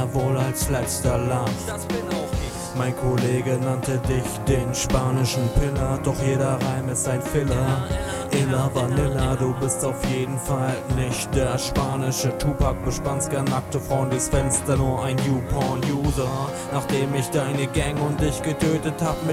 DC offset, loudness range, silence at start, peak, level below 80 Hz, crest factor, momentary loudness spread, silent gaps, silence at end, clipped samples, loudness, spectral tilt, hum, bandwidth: under 0.1%; 1 LU; 0 s; -6 dBFS; -34 dBFS; 16 dB; 4 LU; none; 0 s; under 0.1%; -23 LUFS; -5.5 dB/octave; none; 16 kHz